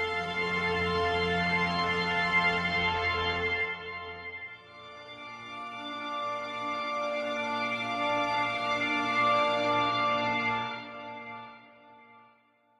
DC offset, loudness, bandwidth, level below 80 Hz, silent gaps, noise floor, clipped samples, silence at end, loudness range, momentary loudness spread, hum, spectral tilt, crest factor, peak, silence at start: under 0.1%; -29 LUFS; 12 kHz; -58 dBFS; none; -65 dBFS; under 0.1%; 0.6 s; 8 LU; 16 LU; none; -4.5 dB/octave; 16 dB; -16 dBFS; 0 s